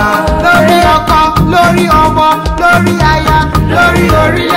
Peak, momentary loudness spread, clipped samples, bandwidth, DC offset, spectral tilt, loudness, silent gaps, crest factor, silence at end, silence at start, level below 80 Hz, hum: 0 dBFS; 3 LU; 0.2%; 16.5 kHz; 0.8%; -5.5 dB/octave; -8 LUFS; none; 8 dB; 0 s; 0 s; -20 dBFS; none